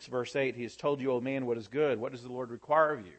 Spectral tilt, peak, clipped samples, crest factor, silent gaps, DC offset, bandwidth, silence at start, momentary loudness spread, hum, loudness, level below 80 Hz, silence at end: -6 dB/octave; -12 dBFS; under 0.1%; 20 dB; none; under 0.1%; 8.6 kHz; 0 s; 12 LU; none; -32 LUFS; -74 dBFS; 0.05 s